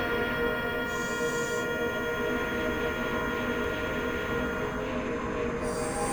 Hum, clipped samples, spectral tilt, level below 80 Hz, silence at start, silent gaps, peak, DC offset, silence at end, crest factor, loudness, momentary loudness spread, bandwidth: none; under 0.1%; -4.5 dB/octave; -46 dBFS; 0 s; none; -18 dBFS; under 0.1%; 0 s; 12 dB; -30 LUFS; 3 LU; over 20 kHz